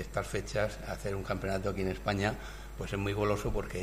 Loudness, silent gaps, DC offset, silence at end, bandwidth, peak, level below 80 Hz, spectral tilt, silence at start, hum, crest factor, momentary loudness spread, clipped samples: -34 LUFS; none; under 0.1%; 0 s; 15.5 kHz; -16 dBFS; -44 dBFS; -5.5 dB/octave; 0 s; none; 18 dB; 7 LU; under 0.1%